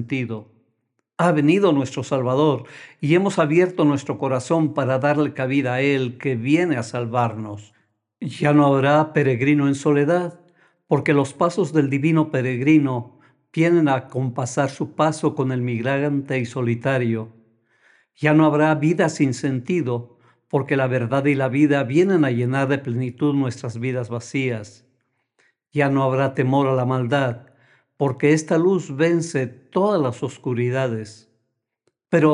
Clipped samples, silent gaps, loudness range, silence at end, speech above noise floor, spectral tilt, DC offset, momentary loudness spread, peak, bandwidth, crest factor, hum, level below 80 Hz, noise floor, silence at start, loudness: under 0.1%; none; 3 LU; 0 s; 55 dB; -7 dB/octave; under 0.1%; 9 LU; -4 dBFS; 11 kHz; 18 dB; none; -70 dBFS; -75 dBFS; 0 s; -20 LUFS